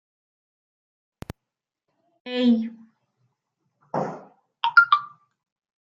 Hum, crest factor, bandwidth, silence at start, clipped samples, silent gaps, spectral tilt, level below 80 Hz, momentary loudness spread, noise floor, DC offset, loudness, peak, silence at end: none; 24 dB; 7.4 kHz; 2.25 s; under 0.1%; none; -6 dB/octave; -64 dBFS; 26 LU; -86 dBFS; under 0.1%; -22 LUFS; -4 dBFS; 0.75 s